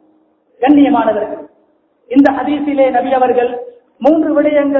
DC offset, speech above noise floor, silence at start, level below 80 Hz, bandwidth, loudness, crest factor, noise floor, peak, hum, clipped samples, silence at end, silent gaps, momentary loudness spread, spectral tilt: under 0.1%; 44 dB; 0.6 s; -52 dBFS; 4.3 kHz; -12 LUFS; 12 dB; -55 dBFS; 0 dBFS; none; 0.2%; 0 s; none; 10 LU; -7.5 dB/octave